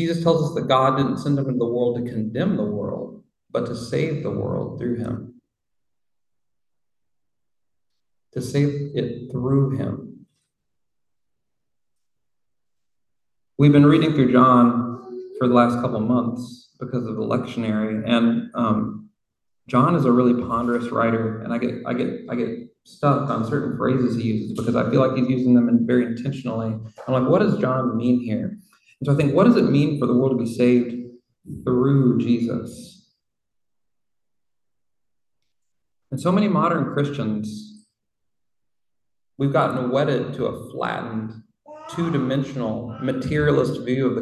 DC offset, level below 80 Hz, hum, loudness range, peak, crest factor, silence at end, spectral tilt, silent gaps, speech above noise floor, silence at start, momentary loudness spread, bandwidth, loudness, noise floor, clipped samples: under 0.1%; -54 dBFS; none; 10 LU; -2 dBFS; 20 dB; 0 s; -8 dB/octave; none; 67 dB; 0 s; 13 LU; 11.5 kHz; -21 LUFS; -87 dBFS; under 0.1%